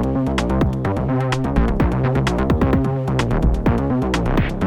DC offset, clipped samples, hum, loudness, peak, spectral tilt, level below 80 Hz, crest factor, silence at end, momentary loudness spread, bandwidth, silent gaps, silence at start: under 0.1%; under 0.1%; none; -19 LUFS; -2 dBFS; -7.5 dB/octave; -24 dBFS; 16 dB; 0 s; 2 LU; 12 kHz; none; 0 s